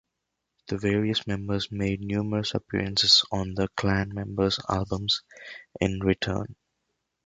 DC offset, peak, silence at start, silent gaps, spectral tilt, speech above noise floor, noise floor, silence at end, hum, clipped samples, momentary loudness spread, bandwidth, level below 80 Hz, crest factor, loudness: under 0.1%; -6 dBFS; 0.65 s; none; -4.5 dB/octave; 55 dB; -82 dBFS; 0.75 s; none; under 0.1%; 13 LU; 9.4 kHz; -48 dBFS; 22 dB; -26 LUFS